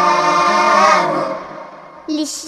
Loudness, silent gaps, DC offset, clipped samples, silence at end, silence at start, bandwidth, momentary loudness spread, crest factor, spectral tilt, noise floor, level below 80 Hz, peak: -14 LUFS; none; under 0.1%; under 0.1%; 0 s; 0 s; 14.5 kHz; 22 LU; 14 dB; -3 dB/octave; -35 dBFS; -56 dBFS; 0 dBFS